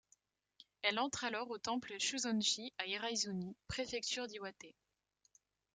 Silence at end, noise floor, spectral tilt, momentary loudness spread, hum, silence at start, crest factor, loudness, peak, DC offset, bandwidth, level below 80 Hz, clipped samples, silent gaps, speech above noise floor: 1.05 s; -80 dBFS; -2 dB/octave; 11 LU; none; 0.85 s; 24 dB; -39 LUFS; -18 dBFS; under 0.1%; 10 kHz; -70 dBFS; under 0.1%; none; 39 dB